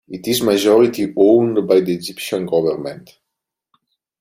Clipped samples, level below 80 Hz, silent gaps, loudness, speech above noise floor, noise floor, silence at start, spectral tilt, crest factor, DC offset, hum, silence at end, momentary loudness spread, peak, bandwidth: under 0.1%; -58 dBFS; none; -16 LUFS; 65 dB; -81 dBFS; 0.1 s; -5 dB/octave; 16 dB; under 0.1%; none; 1.25 s; 11 LU; -2 dBFS; 16 kHz